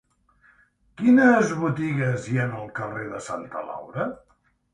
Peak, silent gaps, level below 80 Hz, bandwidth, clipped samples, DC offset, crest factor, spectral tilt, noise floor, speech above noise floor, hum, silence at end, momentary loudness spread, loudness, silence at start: -6 dBFS; none; -60 dBFS; 10 kHz; under 0.1%; under 0.1%; 18 dB; -7 dB/octave; -60 dBFS; 37 dB; none; 0.6 s; 16 LU; -24 LUFS; 1 s